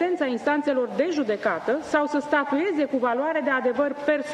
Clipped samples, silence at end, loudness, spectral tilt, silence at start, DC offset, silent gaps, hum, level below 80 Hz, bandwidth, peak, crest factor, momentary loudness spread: under 0.1%; 0 s; -24 LUFS; -5 dB/octave; 0 s; under 0.1%; none; none; -66 dBFS; 10 kHz; -6 dBFS; 16 dB; 2 LU